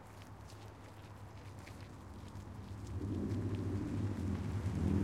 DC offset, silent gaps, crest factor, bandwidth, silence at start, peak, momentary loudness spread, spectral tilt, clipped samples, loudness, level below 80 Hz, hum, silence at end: under 0.1%; none; 18 dB; 13 kHz; 0 s; -22 dBFS; 14 LU; -8 dB/octave; under 0.1%; -42 LUFS; -56 dBFS; none; 0 s